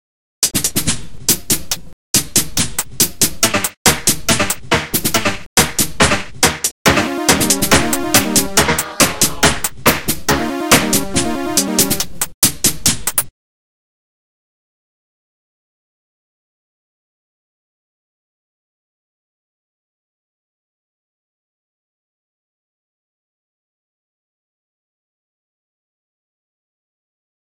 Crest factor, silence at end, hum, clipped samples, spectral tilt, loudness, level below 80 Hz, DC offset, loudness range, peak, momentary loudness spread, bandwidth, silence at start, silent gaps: 20 dB; 14.1 s; none; under 0.1%; -2 dB/octave; -14 LUFS; -38 dBFS; 5%; 4 LU; 0 dBFS; 6 LU; over 20 kHz; 0.4 s; 1.93-2.14 s, 3.77-3.85 s, 5.46-5.56 s, 6.71-6.85 s, 12.34-12.42 s